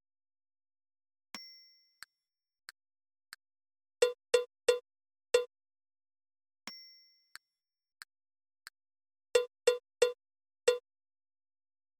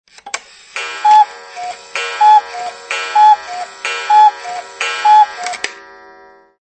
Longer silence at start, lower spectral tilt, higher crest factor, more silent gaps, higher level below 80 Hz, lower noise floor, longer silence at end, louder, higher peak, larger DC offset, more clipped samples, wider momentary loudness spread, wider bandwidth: first, 1.35 s vs 0.25 s; about the same, 0.5 dB/octave vs 1.5 dB/octave; first, 24 dB vs 14 dB; neither; second, -80 dBFS vs -66 dBFS; first, under -90 dBFS vs -43 dBFS; first, 1.2 s vs 0.85 s; second, -33 LUFS vs -12 LUFS; second, -14 dBFS vs 0 dBFS; neither; neither; first, 24 LU vs 17 LU; first, 17 kHz vs 8.8 kHz